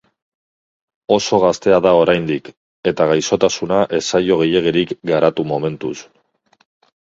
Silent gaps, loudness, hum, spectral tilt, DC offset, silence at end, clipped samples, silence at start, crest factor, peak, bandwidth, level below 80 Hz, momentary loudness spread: 2.57-2.83 s; -16 LUFS; none; -5 dB/octave; under 0.1%; 1 s; under 0.1%; 1.1 s; 18 dB; 0 dBFS; 7.8 kHz; -52 dBFS; 10 LU